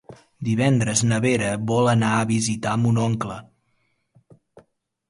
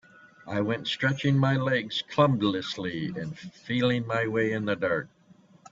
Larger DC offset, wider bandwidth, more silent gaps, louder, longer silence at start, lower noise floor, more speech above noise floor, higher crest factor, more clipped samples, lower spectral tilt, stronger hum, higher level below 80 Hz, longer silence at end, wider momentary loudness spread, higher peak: neither; first, 11.5 kHz vs 7.6 kHz; neither; first, -21 LUFS vs -27 LUFS; second, 0.1 s vs 0.45 s; first, -69 dBFS vs -57 dBFS; first, 48 dB vs 30 dB; about the same, 18 dB vs 20 dB; neither; about the same, -5.5 dB/octave vs -6.5 dB/octave; neither; first, -54 dBFS vs -64 dBFS; first, 1.65 s vs 0.05 s; about the same, 9 LU vs 10 LU; first, -4 dBFS vs -8 dBFS